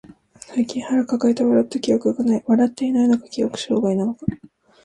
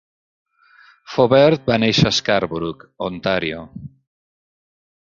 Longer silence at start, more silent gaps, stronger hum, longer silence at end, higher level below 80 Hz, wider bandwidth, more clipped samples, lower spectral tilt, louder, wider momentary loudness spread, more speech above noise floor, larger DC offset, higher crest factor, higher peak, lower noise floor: second, 0.5 s vs 1.1 s; neither; neither; second, 0.5 s vs 1.15 s; second, -54 dBFS vs -48 dBFS; first, 10.5 kHz vs 7.6 kHz; neither; first, -6.5 dB/octave vs -5 dB/octave; about the same, -20 LUFS vs -18 LUFS; second, 7 LU vs 16 LU; second, 24 dB vs 33 dB; neither; about the same, 14 dB vs 18 dB; second, -6 dBFS vs -2 dBFS; second, -44 dBFS vs -51 dBFS